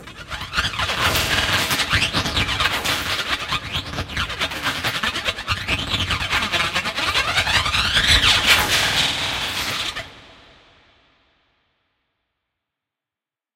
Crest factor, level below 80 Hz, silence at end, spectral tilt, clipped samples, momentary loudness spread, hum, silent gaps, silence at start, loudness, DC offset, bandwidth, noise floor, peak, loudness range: 22 dB; -36 dBFS; 3.2 s; -2 dB/octave; under 0.1%; 10 LU; none; none; 0 s; -19 LUFS; under 0.1%; 16.5 kHz; -89 dBFS; 0 dBFS; 8 LU